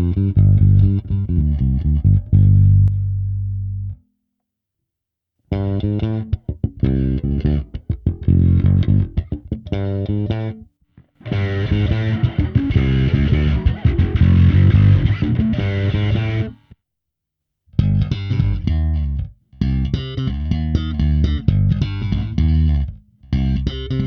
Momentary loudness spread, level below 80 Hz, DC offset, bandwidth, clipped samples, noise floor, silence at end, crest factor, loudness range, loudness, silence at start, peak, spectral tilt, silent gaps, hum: 12 LU; -24 dBFS; under 0.1%; 5.4 kHz; under 0.1%; -82 dBFS; 0 s; 14 dB; 7 LU; -18 LUFS; 0 s; -2 dBFS; -9.5 dB/octave; none; none